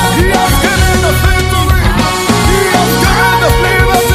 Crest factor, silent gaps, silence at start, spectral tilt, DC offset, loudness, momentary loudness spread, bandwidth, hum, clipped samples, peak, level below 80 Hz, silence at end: 8 dB; none; 0 s; -4.5 dB/octave; under 0.1%; -9 LUFS; 2 LU; 16 kHz; none; 0.2%; 0 dBFS; -16 dBFS; 0 s